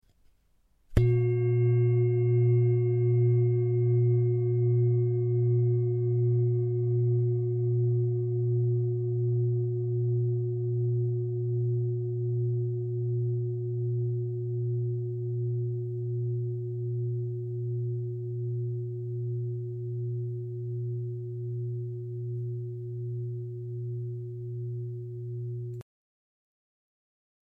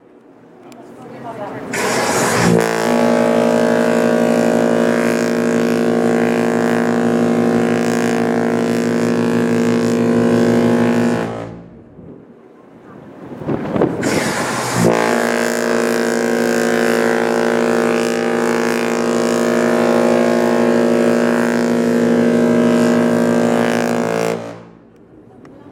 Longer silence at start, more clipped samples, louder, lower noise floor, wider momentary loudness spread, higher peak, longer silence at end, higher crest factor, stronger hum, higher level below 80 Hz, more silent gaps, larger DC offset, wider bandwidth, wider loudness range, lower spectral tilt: first, 0.9 s vs 0.65 s; neither; second, -29 LUFS vs -15 LUFS; first, -66 dBFS vs -44 dBFS; first, 11 LU vs 5 LU; second, -10 dBFS vs -2 dBFS; first, 1.7 s vs 0 s; first, 20 dB vs 14 dB; neither; about the same, -52 dBFS vs -54 dBFS; neither; neither; second, 2.9 kHz vs 16.5 kHz; first, 11 LU vs 4 LU; first, -12 dB/octave vs -5.5 dB/octave